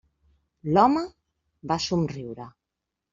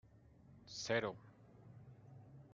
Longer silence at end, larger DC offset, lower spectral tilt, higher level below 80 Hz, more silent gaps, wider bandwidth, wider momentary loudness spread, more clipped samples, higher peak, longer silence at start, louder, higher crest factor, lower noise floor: first, 0.65 s vs 0 s; neither; first, -6 dB/octave vs -4 dB/octave; first, -58 dBFS vs -76 dBFS; neither; second, 7.6 kHz vs 9 kHz; about the same, 22 LU vs 24 LU; neither; first, -4 dBFS vs -24 dBFS; first, 0.65 s vs 0.05 s; first, -24 LUFS vs -42 LUFS; about the same, 22 dB vs 24 dB; first, -85 dBFS vs -65 dBFS